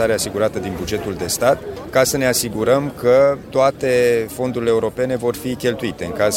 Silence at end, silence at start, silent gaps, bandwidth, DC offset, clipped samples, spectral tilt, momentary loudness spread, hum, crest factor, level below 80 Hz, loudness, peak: 0 s; 0 s; none; 16.5 kHz; under 0.1%; under 0.1%; -4 dB/octave; 8 LU; none; 18 dB; -44 dBFS; -18 LUFS; 0 dBFS